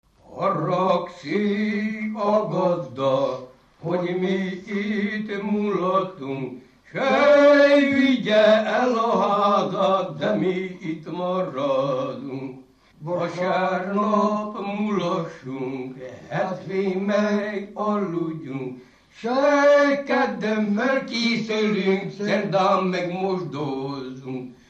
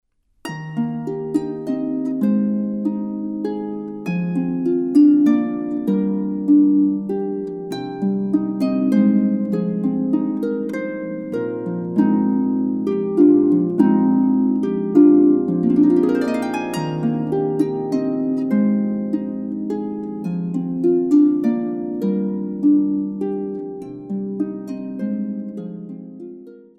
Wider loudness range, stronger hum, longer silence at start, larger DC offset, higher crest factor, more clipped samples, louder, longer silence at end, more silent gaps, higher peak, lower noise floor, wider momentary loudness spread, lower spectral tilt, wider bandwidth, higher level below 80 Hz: about the same, 8 LU vs 7 LU; neither; second, 0.3 s vs 0.45 s; neither; about the same, 16 dB vs 18 dB; neither; second, -22 LUFS vs -19 LUFS; about the same, 0.15 s vs 0.2 s; neither; second, -6 dBFS vs -2 dBFS; first, -47 dBFS vs -39 dBFS; about the same, 14 LU vs 13 LU; second, -6.5 dB/octave vs -9 dB/octave; second, 8 kHz vs 10 kHz; about the same, -64 dBFS vs -62 dBFS